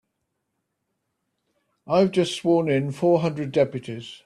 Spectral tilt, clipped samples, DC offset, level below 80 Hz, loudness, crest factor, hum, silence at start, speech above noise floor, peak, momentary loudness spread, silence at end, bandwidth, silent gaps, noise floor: -6.5 dB/octave; under 0.1%; under 0.1%; -64 dBFS; -22 LUFS; 18 dB; none; 1.85 s; 56 dB; -6 dBFS; 5 LU; 0.1 s; 11.5 kHz; none; -78 dBFS